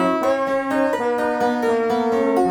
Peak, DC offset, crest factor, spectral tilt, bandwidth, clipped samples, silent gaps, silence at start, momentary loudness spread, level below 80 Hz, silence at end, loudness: -8 dBFS; under 0.1%; 12 dB; -5.5 dB/octave; 18 kHz; under 0.1%; none; 0 s; 2 LU; -56 dBFS; 0 s; -20 LUFS